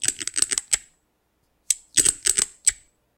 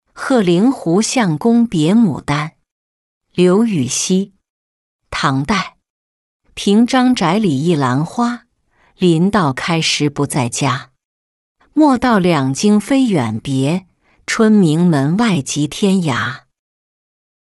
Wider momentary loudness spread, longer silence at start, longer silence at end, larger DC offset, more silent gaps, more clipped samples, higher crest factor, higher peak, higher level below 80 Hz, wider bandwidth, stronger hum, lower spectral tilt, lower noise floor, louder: about the same, 7 LU vs 9 LU; second, 0 s vs 0.15 s; second, 0.45 s vs 1.1 s; neither; second, none vs 2.71-3.21 s, 4.50-4.99 s, 5.90-6.40 s, 11.05-11.55 s; neither; first, 24 dB vs 14 dB; about the same, -2 dBFS vs -2 dBFS; second, -54 dBFS vs -48 dBFS; first, 17 kHz vs 12 kHz; neither; second, 1.5 dB/octave vs -5.5 dB/octave; first, -70 dBFS vs -57 dBFS; second, -21 LUFS vs -15 LUFS